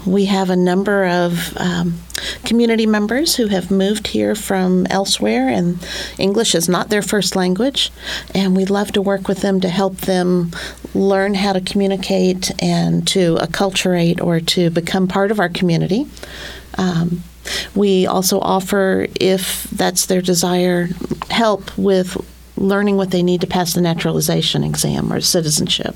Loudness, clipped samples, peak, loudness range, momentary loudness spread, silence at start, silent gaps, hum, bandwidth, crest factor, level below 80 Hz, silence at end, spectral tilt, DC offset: -16 LUFS; under 0.1%; 0 dBFS; 2 LU; 6 LU; 0 s; none; none; 18 kHz; 16 dB; -42 dBFS; 0 s; -4.5 dB/octave; under 0.1%